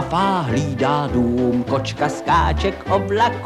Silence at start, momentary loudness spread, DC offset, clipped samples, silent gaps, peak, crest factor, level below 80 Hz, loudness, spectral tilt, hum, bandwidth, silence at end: 0 s; 5 LU; under 0.1%; under 0.1%; none; -4 dBFS; 14 dB; -32 dBFS; -19 LUFS; -6 dB/octave; none; 12.5 kHz; 0 s